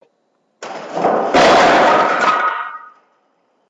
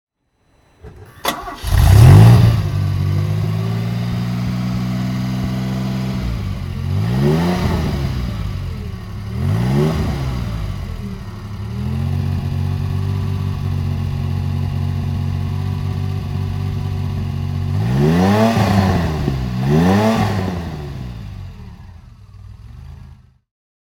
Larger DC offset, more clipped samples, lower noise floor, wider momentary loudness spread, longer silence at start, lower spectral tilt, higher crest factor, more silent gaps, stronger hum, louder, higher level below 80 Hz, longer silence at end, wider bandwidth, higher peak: neither; neither; first, -64 dBFS vs -60 dBFS; first, 21 LU vs 15 LU; second, 0.6 s vs 0.85 s; second, -3.5 dB/octave vs -7.5 dB/octave; second, 12 dB vs 18 dB; neither; neither; first, -13 LUFS vs -18 LUFS; second, -52 dBFS vs -28 dBFS; first, 0.9 s vs 0.7 s; second, 11 kHz vs 17 kHz; about the same, -2 dBFS vs 0 dBFS